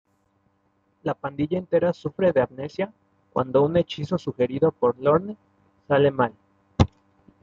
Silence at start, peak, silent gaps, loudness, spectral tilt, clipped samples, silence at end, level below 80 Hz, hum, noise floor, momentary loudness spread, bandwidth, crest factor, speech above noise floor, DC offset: 1.05 s; -4 dBFS; none; -24 LUFS; -8 dB/octave; under 0.1%; 0.55 s; -48 dBFS; none; -67 dBFS; 10 LU; 7.4 kHz; 22 dB; 45 dB; under 0.1%